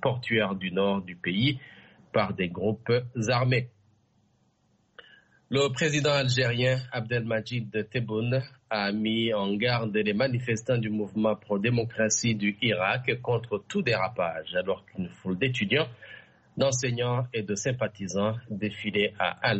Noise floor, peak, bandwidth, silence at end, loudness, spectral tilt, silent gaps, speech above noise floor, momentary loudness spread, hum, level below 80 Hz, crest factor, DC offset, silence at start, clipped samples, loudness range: -68 dBFS; -10 dBFS; 8.2 kHz; 0 s; -28 LUFS; -5 dB/octave; none; 41 dB; 7 LU; none; -62 dBFS; 18 dB; under 0.1%; 0 s; under 0.1%; 3 LU